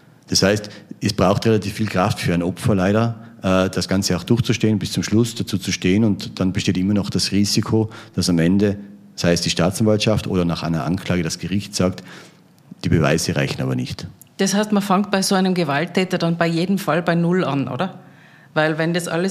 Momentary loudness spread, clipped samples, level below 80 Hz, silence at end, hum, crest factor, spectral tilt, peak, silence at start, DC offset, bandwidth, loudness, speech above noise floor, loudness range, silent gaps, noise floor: 7 LU; under 0.1%; -48 dBFS; 0 s; none; 18 dB; -5 dB/octave; -2 dBFS; 0.3 s; under 0.1%; 15.5 kHz; -19 LUFS; 28 dB; 3 LU; none; -46 dBFS